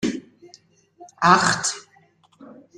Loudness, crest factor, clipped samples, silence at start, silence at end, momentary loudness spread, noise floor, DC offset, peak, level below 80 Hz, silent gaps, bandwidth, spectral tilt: -19 LUFS; 22 dB; under 0.1%; 0 s; 0.35 s; 20 LU; -58 dBFS; under 0.1%; -2 dBFS; -62 dBFS; none; 12.5 kHz; -3 dB/octave